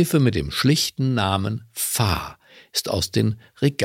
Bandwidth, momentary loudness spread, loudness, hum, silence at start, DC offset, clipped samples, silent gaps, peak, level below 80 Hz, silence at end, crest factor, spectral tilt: 17 kHz; 8 LU; -22 LUFS; none; 0 s; under 0.1%; under 0.1%; none; -2 dBFS; -44 dBFS; 0 s; 20 dB; -4.5 dB/octave